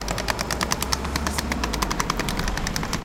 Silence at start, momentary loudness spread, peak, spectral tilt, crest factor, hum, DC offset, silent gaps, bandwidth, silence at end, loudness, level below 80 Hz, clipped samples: 0 s; 2 LU; -2 dBFS; -3 dB/octave; 24 dB; none; under 0.1%; none; 17 kHz; 0 s; -25 LUFS; -32 dBFS; under 0.1%